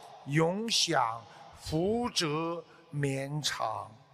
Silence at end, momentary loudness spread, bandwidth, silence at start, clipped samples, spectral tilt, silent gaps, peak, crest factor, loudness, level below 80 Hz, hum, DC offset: 0.15 s; 14 LU; 15 kHz; 0 s; under 0.1%; -4 dB/octave; none; -14 dBFS; 20 dB; -31 LUFS; -60 dBFS; none; under 0.1%